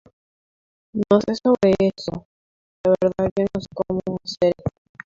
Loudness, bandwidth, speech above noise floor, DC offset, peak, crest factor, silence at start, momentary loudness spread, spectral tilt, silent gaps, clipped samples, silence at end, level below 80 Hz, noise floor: -21 LUFS; 7.6 kHz; over 70 dB; under 0.1%; -2 dBFS; 20 dB; 0.95 s; 13 LU; -7 dB/octave; 2.25-2.84 s, 3.31-3.36 s; under 0.1%; 0.35 s; -50 dBFS; under -90 dBFS